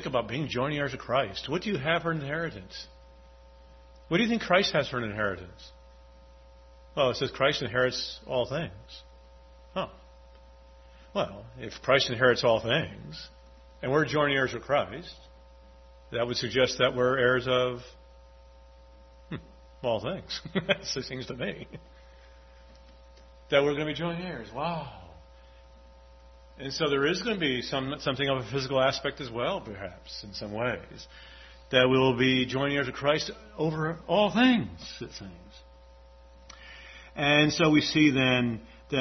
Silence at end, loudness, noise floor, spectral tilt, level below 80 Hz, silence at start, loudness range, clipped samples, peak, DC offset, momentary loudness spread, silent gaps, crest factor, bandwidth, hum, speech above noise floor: 0 s; -27 LUFS; -53 dBFS; -5 dB/octave; -54 dBFS; 0 s; 7 LU; under 0.1%; -8 dBFS; under 0.1%; 20 LU; none; 22 dB; 6.4 kHz; none; 25 dB